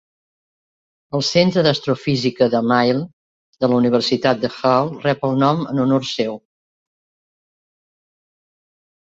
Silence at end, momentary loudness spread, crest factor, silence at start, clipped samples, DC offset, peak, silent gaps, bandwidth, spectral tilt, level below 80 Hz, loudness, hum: 2.8 s; 8 LU; 18 dB; 1.15 s; under 0.1%; under 0.1%; -2 dBFS; 3.13-3.53 s; 7.8 kHz; -6 dB/octave; -58 dBFS; -18 LUFS; none